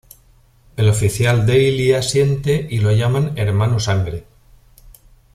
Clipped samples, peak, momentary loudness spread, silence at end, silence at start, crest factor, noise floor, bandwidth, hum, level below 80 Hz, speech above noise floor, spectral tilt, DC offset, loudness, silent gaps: under 0.1%; -2 dBFS; 6 LU; 1.15 s; 0.75 s; 14 dB; -51 dBFS; 14.5 kHz; none; -40 dBFS; 36 dB; -6 dB/octave; under 0.1%; -17 LUFS; none